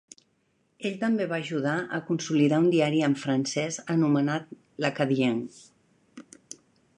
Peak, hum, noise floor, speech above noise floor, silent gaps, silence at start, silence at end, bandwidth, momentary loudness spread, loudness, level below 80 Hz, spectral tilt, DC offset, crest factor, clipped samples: -10 dBFS; none; -70 dBFS; 45 dB; none; 0.8 s; 0.75 s; 10.5 kHz; 17 LU; -26 LUFS; -74 dBFS; -5.5 dB/octave; under 0.1%; 18 dB; under 0.1%